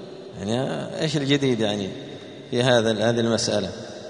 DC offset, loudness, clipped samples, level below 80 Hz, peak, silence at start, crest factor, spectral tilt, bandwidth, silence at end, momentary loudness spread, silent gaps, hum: under 0.1%; -23 LUFS; under 0.1%; -58 dBFS; -4 dBFS; 0 s; 20 dB; -5 dB/octave; 10.5 kHz; 0 s; 15 LU; none; none